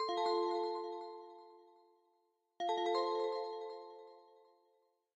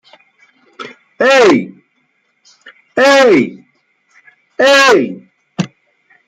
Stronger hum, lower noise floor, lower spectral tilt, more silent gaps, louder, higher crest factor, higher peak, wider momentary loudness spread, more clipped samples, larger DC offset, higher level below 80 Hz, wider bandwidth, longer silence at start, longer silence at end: neither; first, -79 dBFS vs -61 dBFS; about the same, -2.5 dB/octave vs -3.5 dB/octave; neither; second, -38 LUFS vs -10 LUFS; about the same, 16 dB vs 14 dB; second, -24 dBFS vs 0 dBFS; second, 21 LU vs 24 LU; neither; neither; second, under -90 dBFS vs -60 dBFS; second, 8.2 kHz vs 15 kHz; second, 0 s vs 0.8 s; first, 0.95 s vs 0.6 s